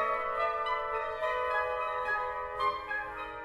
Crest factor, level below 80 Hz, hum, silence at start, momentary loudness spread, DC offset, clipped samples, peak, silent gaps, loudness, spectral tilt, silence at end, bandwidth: 14 dB; -58 dBFS; none; 0 s; 5 LU; under 0.1%; under 0.1%; -18 dBFS; none; -32 LUFS; -3.5 dB/octave; 0 s; 13 kHz